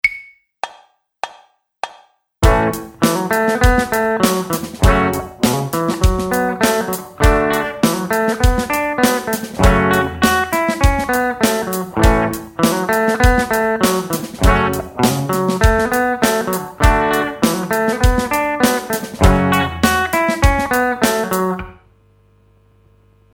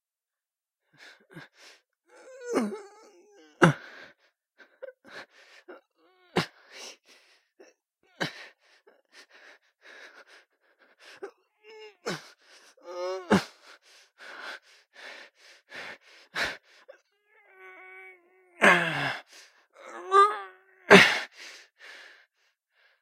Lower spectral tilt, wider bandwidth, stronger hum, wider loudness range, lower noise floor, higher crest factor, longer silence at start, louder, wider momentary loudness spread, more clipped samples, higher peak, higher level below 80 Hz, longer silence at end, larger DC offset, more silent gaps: about the same, -5 dB/octave vs -4.5 dB/octave; first, 18.5 kHz vs 16 kHz; neither; second, 2 LU vs 20 LU; second, -52 dBFS vs under -90 dBFS; second, 16 dB vs 30 dB; second, 0.05 s vs 1.35 s; first, -16 LUFS vs -24 LUFS; second, 8 LU vs 28 LU; neither; about the same, 0 dBFS vs 0 dBFS; first, -24 dBFS vs -72 dBFS; about the same, 1.6 s vs 1.5 s; neither; neither